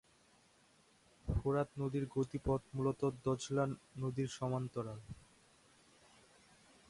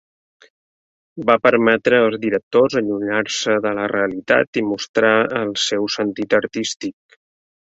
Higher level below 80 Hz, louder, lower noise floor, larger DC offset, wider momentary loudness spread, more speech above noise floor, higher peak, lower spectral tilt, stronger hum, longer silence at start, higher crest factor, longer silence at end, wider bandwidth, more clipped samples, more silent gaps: about the same, -56 dBFS vs -60 dBFS; second, -39 LUFS vs -18 LUFS; second, -69 dBFS vs under -90 dBFS; neither; about the same, 10 LU vs 8 LU; second, 31 dB vs over 72 dB; second, -22 dBFS vs -2 dBFS; first, -7 dB/octave vs -4 dB/octave; neither; about the same, 1.25 s vs 1.15 s; about the same, 18 dB vs 18 dB; first, 1.7 s vs 0.85 s; first, 11.5 kHz vs 8 kHz; neither; second, none vs 2.43-2.51 s, 4.47-4.53 s, 4.89-4.94 s